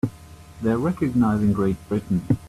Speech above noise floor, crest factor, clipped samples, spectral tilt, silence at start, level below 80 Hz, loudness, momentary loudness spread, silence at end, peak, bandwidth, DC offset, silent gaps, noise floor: 22 dB; 16 dB; under 0.1%; -9 dB/octave; 0.05 s; -46 dBFS; -23 LUFS; 7 LU; 0 s; -8 dBFS; 13.5 kHz; under 0.1%; none; -44 dBFS